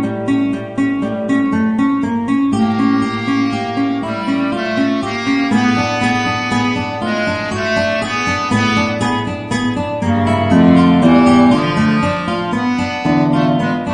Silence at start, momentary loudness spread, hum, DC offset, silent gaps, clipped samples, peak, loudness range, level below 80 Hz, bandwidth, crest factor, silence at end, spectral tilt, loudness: 0 s; 8 LU; none; under 0.1%; none; under 0.1%; 0 dBFS; 4 LU; -44 dBFS; 10 kHz; 14 dB; 0 s; -6 dB/octave; -15 LUFS